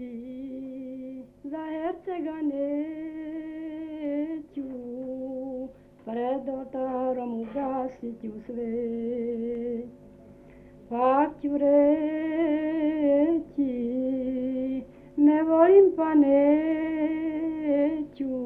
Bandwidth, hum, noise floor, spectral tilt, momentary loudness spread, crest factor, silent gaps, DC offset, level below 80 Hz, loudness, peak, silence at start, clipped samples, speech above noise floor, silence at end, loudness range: 3.6 kHz; none; -50 dBFS; -9 dB/octave; 17 LU; 18 dB; none; under 0.1%; -60 dBFS; -26 LUFS; -8 dBFS; 0 s; under 0.1%; 25 dB; 0 s; 11 LU